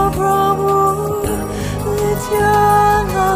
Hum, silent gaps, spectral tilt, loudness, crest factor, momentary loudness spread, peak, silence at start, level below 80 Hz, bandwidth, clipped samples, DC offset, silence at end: none; none; -5.5 dB/octave; -15 LUFS; 12 dB; 9 LU; -2 dBFS; 0 s; -30 dBFS; 16 kHz; under 0.1%; under 0.1%; 0 s